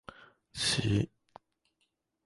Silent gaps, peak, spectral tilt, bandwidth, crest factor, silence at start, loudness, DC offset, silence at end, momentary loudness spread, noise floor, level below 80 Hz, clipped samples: none; -16 dBFS; -4 dB/octave; 11.5 kHz; 20 dB; 0.55 s; -31 LUFS; under 0.1%; 1.2 s; 18 LU; -80 dBFS; -54 dBFS; under 0.1%